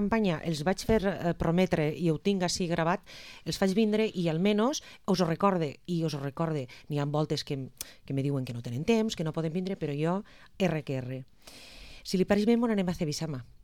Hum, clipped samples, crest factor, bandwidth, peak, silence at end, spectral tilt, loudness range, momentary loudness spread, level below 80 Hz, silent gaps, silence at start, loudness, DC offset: none; under 0.1%; 18 dB; 18 kHz; -10 dBFS; 0.2 s; -6 dB/octave; 4 LU; 10 LU; -52 dBFS; none; 0 s; -30 LUFS; 0.1%